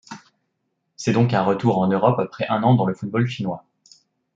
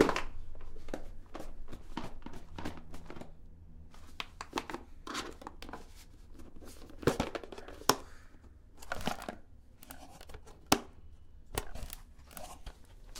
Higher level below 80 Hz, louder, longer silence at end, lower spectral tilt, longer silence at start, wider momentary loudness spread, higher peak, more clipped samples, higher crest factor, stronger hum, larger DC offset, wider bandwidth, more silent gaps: second, -64 dBFS vs -48 dBFS; first, -21 LUFS vs -39 LUFS; first, 0.75 s vs 0 s; first, -7.5 dB/octave vs -3.5 dB/octave; about the same, 0.1 s vs 0 s; second, 11 LU vs 25 LU; about the same, -2 dBFS vs -4 dBFS; neither; second, 18 dB vs 36 dB; neither; neither; second, 7.8 kHz vs 17.5 kHz; neither